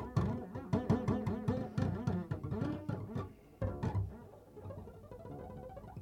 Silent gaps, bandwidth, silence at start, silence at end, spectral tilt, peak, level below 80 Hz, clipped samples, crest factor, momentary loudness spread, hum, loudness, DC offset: none; 10.5 kHz; 0 s; 0 s; -9 dB/octave; -20 dBFS; -54 dBFS; under 0.1%; 18 dB; 16 LU; none; -39 LUFS; under 0.1%